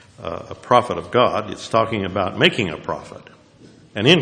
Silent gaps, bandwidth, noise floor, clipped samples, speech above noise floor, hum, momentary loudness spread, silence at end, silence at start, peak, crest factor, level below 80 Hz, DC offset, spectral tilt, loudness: none; 11 kHz; -48 dBFS; under 0.1%; 28 dB; none; 14 LU; 0 s; 0.2 s; 0 dBFS; 20 dB; -54 dBFS; under 0.1%; -5 dB/octave; -19 LUFS